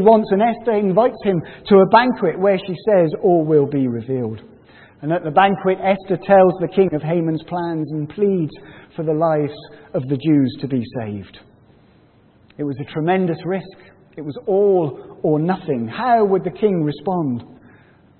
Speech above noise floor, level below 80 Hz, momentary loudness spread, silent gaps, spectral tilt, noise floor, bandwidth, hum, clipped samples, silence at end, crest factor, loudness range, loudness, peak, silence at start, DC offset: 35 dB; -56 dBFS; 13 LU; none; -11.5 dB/octave; -52 dBFS; 4.4 kHz; none; under 0.1%; 0.75 s; 18 dB; 8 LU; -18 LUFS; 0 dBFS; 0 s; under 0.1%